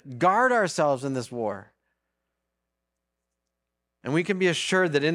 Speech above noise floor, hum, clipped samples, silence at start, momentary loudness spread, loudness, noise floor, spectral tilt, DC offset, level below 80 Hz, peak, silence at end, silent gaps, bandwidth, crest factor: 59 dB; none; under 0.1%; 0.05 s; 11 LU; -24 LUFS; -83 dBFS; -4.5 dB/octave; under 0.1%; -74 dBFS; -8 dBFS; 0 s; none; 13.5 kHz; 18 dB